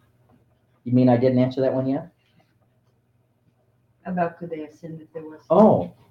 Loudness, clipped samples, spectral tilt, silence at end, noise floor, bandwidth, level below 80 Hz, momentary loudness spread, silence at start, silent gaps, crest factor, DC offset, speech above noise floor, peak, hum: -20 LUFS; under 0.1%; -10 dB/octave; 0.2 s; -65 dBFS; 6 kHz; -66 dBFS; 22 LU; 0.85 s; none; 20 dB; under 0.1%; 44 dB; -2 dBFS; none